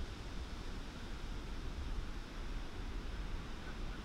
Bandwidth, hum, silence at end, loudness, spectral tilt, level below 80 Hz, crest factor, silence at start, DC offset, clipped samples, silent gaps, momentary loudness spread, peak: 13 kHz; none; 0 s; -47 LUFS; -5 dB/octave; -44 dBFS; 14 dB; 0 s; under 0.1%; under 0.1%; none; 2 LU; -30 dBFS